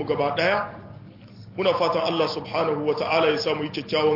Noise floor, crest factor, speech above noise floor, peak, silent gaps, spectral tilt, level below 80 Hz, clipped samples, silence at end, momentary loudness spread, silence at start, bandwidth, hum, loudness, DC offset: -44 dBFS; 16 dB; 21 dB; -8 dBFS; none; -5.5 dB/octave; -62 dBFS; under 0.1%; 0 s; 11 LU; 0 s; 5.8 kHz; none; -23 LUFS; under 0.1%